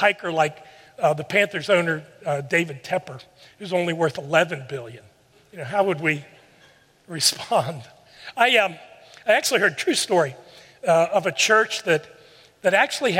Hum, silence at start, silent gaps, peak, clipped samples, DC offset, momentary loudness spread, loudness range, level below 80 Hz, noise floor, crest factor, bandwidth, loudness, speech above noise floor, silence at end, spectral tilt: none; 0 s; none; -2 dBFS; under 0.1%; under 0.1%; 17 LU; 5 LU; -70 dBFS; -55 dBFS; 20 dB; 16 kHz; -21 LUFS; 33 dB; 0 s; -3 dB/octave